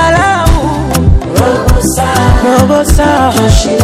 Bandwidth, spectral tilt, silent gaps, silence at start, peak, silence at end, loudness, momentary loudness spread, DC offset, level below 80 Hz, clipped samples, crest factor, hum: 16.5 kHz; -5.5 dB/octave; none; 0 s; 0 dBFS; 0 s; -9 LUFS; 3 LU; under 0.1%; -14 dBFS; 3%; 8 dB; none